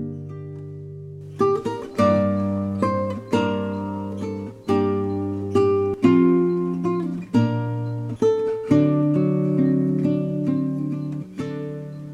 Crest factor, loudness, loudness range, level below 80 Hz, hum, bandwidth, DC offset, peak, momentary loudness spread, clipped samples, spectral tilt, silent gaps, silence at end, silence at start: 18 dB; -22 LUFS; 3 LU; -58 dBFS; none; 11 kHz; under 0.1%; -4 dBFS; 14 LU; under 0.1%; -9 dB/octave; none; 0 s; 0 s